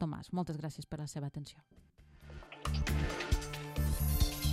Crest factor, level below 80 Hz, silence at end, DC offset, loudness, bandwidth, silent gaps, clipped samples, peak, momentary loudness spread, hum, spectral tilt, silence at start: 18 dB; -40 dBFS; 0 s; under 0.1%; -37 LUFS; 16 kHz; none; under 0.1%; -18 dBFS; 16 LU; none; -5 dB/octave; 0 s